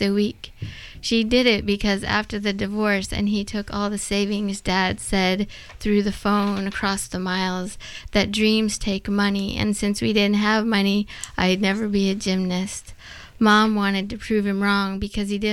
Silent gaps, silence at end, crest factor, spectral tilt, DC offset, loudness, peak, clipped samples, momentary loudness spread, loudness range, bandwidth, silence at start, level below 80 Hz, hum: none; 0 s; 16 dB; -4.5 dB/octave; under 0.1%; -22 LUFS; -6 dBFS; under 0.1%; 11 LU; 2 LU; 13.5 kHz; 0 s; -40 dBFS; none